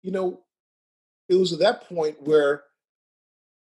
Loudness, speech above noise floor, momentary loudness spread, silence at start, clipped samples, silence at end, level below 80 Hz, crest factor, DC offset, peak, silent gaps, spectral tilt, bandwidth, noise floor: -23 LUFS; over 68 dB; 8 LU; 0.05 s; under 0.1%; 1.15 s; -74 dBFS; 18 dB; under 0.1%; -8 dBFS; 0.60-1.29 s; -5.5 dB/octave; 11 kHz; under -90 dBFS